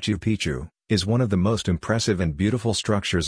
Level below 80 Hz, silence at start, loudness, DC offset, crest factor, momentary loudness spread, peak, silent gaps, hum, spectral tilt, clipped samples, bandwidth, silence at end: -42 dBFS; 0 s; -23 LUFS; under 0.1%; 16 dB; 4 LU; -8 dBFS; none; none; -5.5 dB/octave; under 0.1%; 10.5 kHz; 0 s